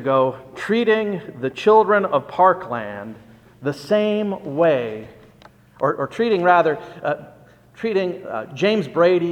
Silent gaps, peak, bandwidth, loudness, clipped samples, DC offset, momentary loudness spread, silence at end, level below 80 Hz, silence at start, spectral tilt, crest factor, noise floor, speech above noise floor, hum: none; -2 dBFS; 10 kHz; -20 LUFS; under 0.1%; under 0.1%; 14 LU; 0 s; -62 dBFS; 0 s; -6.5 dB/octave; 18 dB; -49 dBFS; 30 dB; none